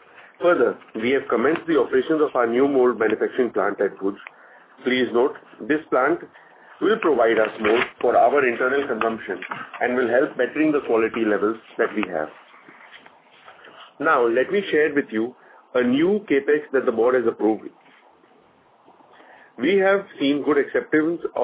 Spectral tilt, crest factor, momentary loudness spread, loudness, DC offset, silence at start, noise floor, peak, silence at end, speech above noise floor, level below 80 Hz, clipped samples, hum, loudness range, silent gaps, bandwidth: -9 dB/octave; 16 dB; 8 LU; -21 LUFS; under 0.1%; 0.4 s; -56 dBFS; -6 dBFS; 0 s; 35 dB; -64 dBFS; under 0.1%; none; 4 LU; none; 4 kHz